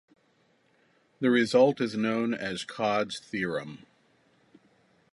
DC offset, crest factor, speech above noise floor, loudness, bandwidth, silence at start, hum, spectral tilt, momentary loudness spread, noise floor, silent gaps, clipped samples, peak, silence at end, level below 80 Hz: under 0.1%; 20 dB; 41 dB; -27 LUFS; 11.5 kHz; 1.2 s; none; -5.5 dB/octave; 12 LU; -68 dBFS; none; under 0.1%; -10 dBFS; 1.35 s; -70 dBFS